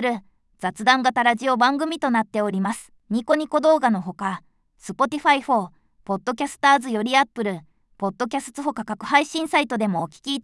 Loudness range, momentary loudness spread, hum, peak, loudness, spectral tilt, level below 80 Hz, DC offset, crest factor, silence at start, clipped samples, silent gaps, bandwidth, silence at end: 2 LU; 12 LU; none; -4 dBFS; -22 LUFS; -4.5 dB/octave; -64 dBFS; under 0.1%; 18 dB; 0 s; under 0.1%; none; 12 kHz; 0.05 s